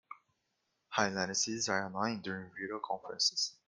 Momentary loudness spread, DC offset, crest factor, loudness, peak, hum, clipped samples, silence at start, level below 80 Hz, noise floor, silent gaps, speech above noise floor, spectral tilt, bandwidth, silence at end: 11 LU; under 0.1%; 24 dB; -34 LUFS; -12 dBFS; none; under 0.1%; 0.1 s; -76 dBFS; -82 dBFS; none; 46 dB; -2 dB/octave; 11.5 kHz; 0.15 s